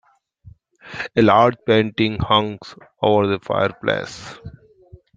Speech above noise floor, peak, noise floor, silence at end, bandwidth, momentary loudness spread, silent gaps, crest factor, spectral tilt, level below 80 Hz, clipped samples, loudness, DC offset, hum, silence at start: 29 dB; -2 dBFS; -48 dBFS; 0.65 s; 9 kHz; 21 LU; none; 20 dB; -6.5 dB/octave; -48 dBFS; under 0.1%; -18 LUFS; under 0.1%; none; 0.85 s